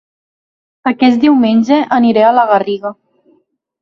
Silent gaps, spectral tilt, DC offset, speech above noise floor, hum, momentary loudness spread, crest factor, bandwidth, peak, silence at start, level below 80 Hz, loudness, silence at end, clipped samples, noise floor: none; -6.5 dB/octave; under 0.1%; 47 dB; none; 11 LU; 12 dB; 7 kHz; 0 dBFS; 0.85 s; -58 dBFS; -11 LUFS; 0.9 s; under 0.1%; -57 dBFS